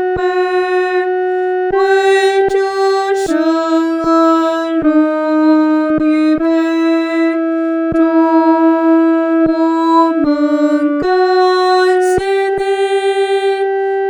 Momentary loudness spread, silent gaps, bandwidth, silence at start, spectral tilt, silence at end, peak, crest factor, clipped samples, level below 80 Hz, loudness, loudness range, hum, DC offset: 4 LU; none; 10.5 kHz; 0 s; -5 dB/octave; 0 s; 0 dBFS; 12 dB; under 0.1%; -46 dBFS; -13 LUFS; 1 LU; none; under 0.1%